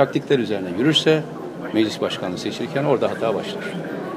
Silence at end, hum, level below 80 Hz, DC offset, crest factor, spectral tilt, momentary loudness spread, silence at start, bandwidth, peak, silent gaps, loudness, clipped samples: 0 s; none; -66 dBFS; under 0.1%; 20 dB; -5.5 dB/octave; 11 LU; 0 s; 15 kHz; -2 dBFS; none; -21 LUFS; under 0.1%